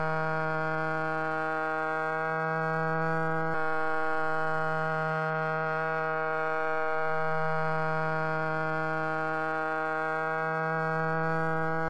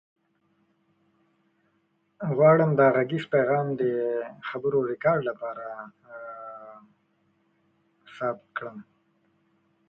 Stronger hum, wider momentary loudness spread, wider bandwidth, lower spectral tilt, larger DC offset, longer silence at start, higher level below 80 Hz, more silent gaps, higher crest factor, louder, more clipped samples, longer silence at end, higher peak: neither; second, 1 LU vs 22 LU; first, 9.8 kHz vs 5.6 kHz; second, -7.5 dB/octave vs -9.5 dB/octave; neither; second, 0 s vs 2.2 s; about the same, -66 dBFS vs -70 dBFS; neither; second, 12 dB vs 20 dB; second, -30 LUFS vs -25 LUFS; neither; second, 0 s vs 1.05 s; second, -18 dBFS vs -8 dBFS